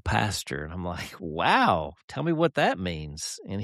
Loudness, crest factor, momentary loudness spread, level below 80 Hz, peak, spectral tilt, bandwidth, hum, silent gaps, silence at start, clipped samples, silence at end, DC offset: -27 LUFS; 20 dB; 13 LU; -46 dBFS; -8 dBFS; -4.5 dB/octave; 14 kHz; none; 2.03-2.08 s; 0.05 s; under 0.1%; 0 s; under 0.1%